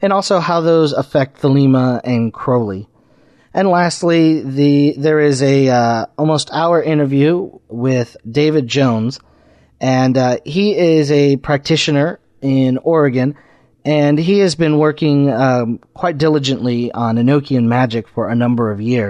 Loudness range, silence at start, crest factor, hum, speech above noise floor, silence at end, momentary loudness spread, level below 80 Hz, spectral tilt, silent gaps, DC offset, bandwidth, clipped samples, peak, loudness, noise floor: 2 LU; 0 s; 12 dB; none; 37 dB; 0 s; 7 LU; -52 dBFS; -6.5 dB/octave; none; under 0.1%; 10.5 kHz; under 0.1%; -2 dBFS; -14 LUFS; -50 dBFS